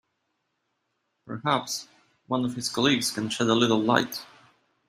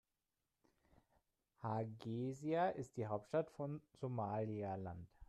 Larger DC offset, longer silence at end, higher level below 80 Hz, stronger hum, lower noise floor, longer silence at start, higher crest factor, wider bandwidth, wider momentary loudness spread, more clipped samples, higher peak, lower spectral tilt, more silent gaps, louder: neither; first, 0.65 s vs 0.05 s; first, -66 dBFS vs -76 dBFS; neither; second, -77 dBFS vs under -90 dBFS; second, 1.25 s vs 1.6 s; first, 24 dB vs 18 dB; first, 15.5 kHz vs 11.5 kHz; first, 12 LU vs 9 LU; neither; first, -4 dBFS vs -28 dBFS; second, -4 dB/octave vs -8 dB/octave; neither; first, -25 LUFS vs -44 LUFS